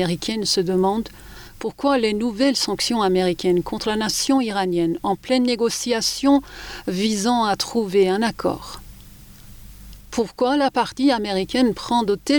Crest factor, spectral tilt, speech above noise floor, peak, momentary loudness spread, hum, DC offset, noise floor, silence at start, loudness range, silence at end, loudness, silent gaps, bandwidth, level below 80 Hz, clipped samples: 14 dB; -4 dB/octave; 23 dB; -6 dBFS; 9 LU; none; under 0.1%; -43 dBFS; 0 s; 3 LU; 0 s; -21 LUFS; none; over 20 kHz; -46 dBFS; under 0.1%